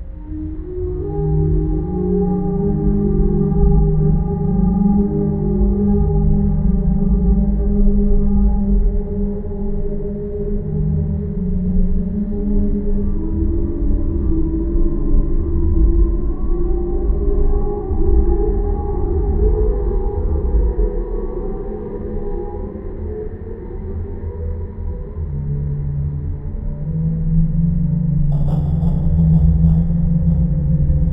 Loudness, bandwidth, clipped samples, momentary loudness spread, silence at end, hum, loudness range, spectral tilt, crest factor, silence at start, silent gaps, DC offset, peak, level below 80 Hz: -19 LUFS; 2.1 kHz; under 0.1%; 11 LU; 0 s; none; 9 LU; -14 dB/octave; 14 dB; 0 s; none; under 0.1%; -2 dBFS; -18 dBFS